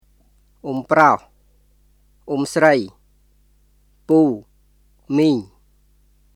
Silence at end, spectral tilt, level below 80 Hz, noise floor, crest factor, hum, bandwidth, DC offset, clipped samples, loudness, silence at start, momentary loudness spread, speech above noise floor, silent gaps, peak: 0.9 s; -6 dB/octave; -56 dBFS; -57 dBFS; 22 dB; 50 Hz at -50 dBFS; 13 kHz; under 0.1%; under 0.1%; -18 LUFS; 0.65 s; 14 LU; 40 dB; none; 0 dBFS